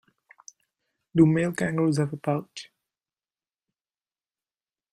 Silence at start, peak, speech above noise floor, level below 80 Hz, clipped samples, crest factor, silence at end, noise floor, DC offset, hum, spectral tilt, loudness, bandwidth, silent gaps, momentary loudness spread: 1.15 s; -6 dBFS; over 66 dB; -64 dBFS; under 0.1%; 22 dB; 2.3 s; under -90 dBFS; under 0.1%; none; -7 dB/octave; -24 LUFS; 13.5 kHz; none; 14 LU